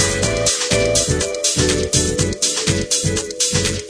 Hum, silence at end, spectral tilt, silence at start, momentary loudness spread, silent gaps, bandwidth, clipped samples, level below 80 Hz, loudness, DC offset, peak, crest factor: none; 0 s; -3 dB/octave; 0 s; 3 LU; none; 11 kHz; under 0.1%; -32 dBFS; -16 LUFS; under 0.1%; -2 dBFS; 16 dB